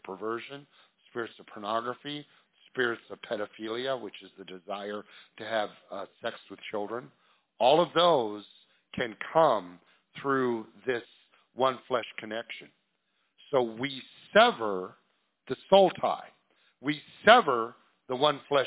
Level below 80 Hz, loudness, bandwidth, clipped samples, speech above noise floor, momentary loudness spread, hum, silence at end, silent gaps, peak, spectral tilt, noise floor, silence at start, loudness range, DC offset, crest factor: -72 dBFS; -29 LUFS; 4 kHz; under 0.1%; 48 dB; 20 LU; none; 0 s; none; -4 dBFS; -8 dB/octave; -76 dBFS; 0.05 s; 10 LU; under 0.1%; 26 dB